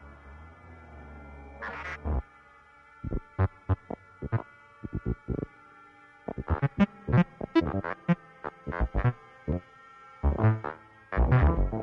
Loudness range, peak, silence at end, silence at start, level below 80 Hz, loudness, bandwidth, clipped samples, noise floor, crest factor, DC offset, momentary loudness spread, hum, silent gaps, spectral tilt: 7 LU; -12 dBFS; 0 s; 0 s; -36 dBFS; -30 LUFS; 6.2 kHz; under 0.1%; -56 dBFS; 18 dB; under 0.1%; 22 LU; none; none; -9.5 dB/octave